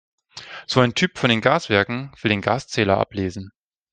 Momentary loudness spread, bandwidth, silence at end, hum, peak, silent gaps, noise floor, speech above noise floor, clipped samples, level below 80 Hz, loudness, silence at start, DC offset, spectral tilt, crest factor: 16 LU; 9.6 kHz; 0.45 s; none; 0 dBFS; none; -40 dBFS; 19 dB; under 0.1%; -56 dBFS; -20 LUFS; 0.35 s; under 0.1%; -5 dB/octave; 20 dB